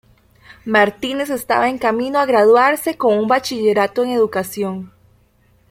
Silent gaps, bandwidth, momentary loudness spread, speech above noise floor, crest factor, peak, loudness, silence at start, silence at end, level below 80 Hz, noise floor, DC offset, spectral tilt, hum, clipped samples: none; 16.5 kHz; 11 LU; 39 dB; 16 dB; -2 dBFS; -16 LUFS; 0.5 s; 0.85 s; -56 dBFS; -55 dBFS; under 0.1%; -4.5 dB/octave; 60 Hz at -45 dBFS; under 0.1%